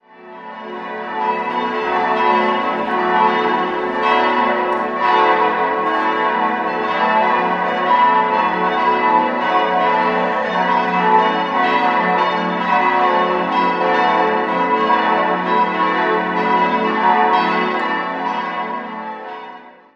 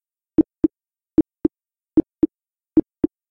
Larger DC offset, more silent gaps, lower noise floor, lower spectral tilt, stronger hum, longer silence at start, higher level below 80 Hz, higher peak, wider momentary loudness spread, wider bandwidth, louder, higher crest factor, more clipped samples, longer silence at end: neither; neither; second, -38 dBFS vs -79 dBFS; second, -6 dB/octave vs -12 dB/octave; neither; second, 0.2 s vs 0.4 s; second, -56 dBFS vs -46 dBFS; first, -2 dBFS vs -6 dBFS; about the same, 7 LU vs 6 LU; first, 7.4 kHz vs 2.4 kHz; first, -16 LUFS vs -22 LUFS; about the same, 14 dB vs 16 dB; neither; about the same, 0.25 s vs 0.25 s